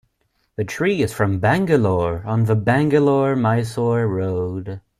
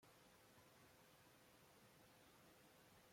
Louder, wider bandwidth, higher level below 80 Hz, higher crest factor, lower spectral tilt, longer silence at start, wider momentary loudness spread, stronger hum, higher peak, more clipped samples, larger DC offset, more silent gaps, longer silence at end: first, -19 LUFS vs -69 LUFS; second, 14 kHz vs 16.5 kHz; first, -48 dBFS vs -90 dBFS; about the same, 16 dB vs 12 dB; first, -7.5 dB/octave vs -3.5 dB/octave; first, 0.6 s vs 0 s; first, 10 LU vs 1 LU; neither; first, -2 dBFS vs -58 dBFS; neither; neither; neither; first, 0.2 s vs 0 s